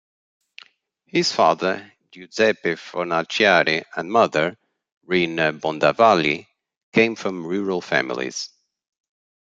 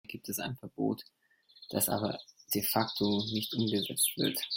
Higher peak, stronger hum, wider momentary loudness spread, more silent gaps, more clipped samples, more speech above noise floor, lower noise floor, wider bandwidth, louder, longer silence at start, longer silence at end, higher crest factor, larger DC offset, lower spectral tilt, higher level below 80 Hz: first, 0 dBFS vs -14 dBFS; neither; about the same, 11 LU vs 10 LU; first, 4.92-5.01 s, 6.77-6.92 s vs none; neither; first, 40 dB vs 22 dB; first, -60 dBFS vs -55 dBFS; second, 9.2 kHz vs 16.5 kHz; first, -20 LUFS vs -32 LUFS; first, 1.15 s vs 0.1 s; first, 1 s vs 0 s; about the same, 22 dB vs 20 dB; neither; about the same, -4 dB/octave vs -3.5 dB/octave; about the same, -66 dBFS vs -68 dBFS